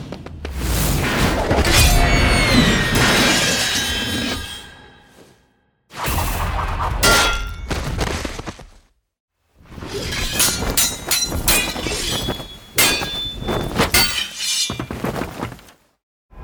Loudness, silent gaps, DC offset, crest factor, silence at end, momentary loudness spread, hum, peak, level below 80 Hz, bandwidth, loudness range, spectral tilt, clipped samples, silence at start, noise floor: -18 LUFS; 9.20-9.28 s, 16.03-16.29 s; under 0.1%; 18 dB; 0 s; 15 LU; none; -2 dBFS; -28 dBFS; over 20 kHz; 7 LU; -3 dB/octave; under 0.1%; 0 s; -61 dBFS